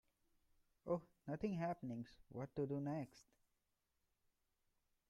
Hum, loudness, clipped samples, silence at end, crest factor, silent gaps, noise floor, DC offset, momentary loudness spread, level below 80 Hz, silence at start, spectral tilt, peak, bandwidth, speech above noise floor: none; -47 LUFS; under 0.1%; 1.85 s; 20 dB; none; -87 dBFS; under 0.1%; 10 LU; -76 dBFS; 0.85 s; -8.5 dB/octave; -30 dBFS; 13.5 kHz; 41 dB